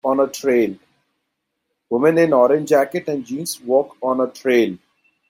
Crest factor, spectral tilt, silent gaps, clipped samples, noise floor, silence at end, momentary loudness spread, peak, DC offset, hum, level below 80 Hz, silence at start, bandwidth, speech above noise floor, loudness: 16 dB; -5 dB/octave; none; under 0.1%; -76 dBFS; 0.55 s; 11 LU; -2 dBFS; under 0.1%; none; -66 dBFS; 0.05 s; 16.5 kHz; 58 dB; -18 LUFS